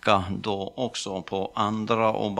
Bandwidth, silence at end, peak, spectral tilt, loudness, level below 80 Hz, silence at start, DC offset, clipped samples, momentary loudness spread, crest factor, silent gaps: 12 kHz; 0 s; -4 dBFS; -5 dB/octave; -27 LUFS; -58 dBFS; 0.05 s; under 0.1%; under 0.1%; 7 LU; 22 dB; none